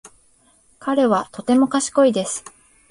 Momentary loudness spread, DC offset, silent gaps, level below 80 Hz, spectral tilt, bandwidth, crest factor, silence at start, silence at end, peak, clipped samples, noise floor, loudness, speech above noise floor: 11 LU; under 0.1%; none; -60 dBFS; -4 dB/octave; 11.5 kHz; 16 dB; 0.05 s; 0.5 s; -4 dBFS; under 0.1%; -57 dBFS; -19 LUFS; 39 dB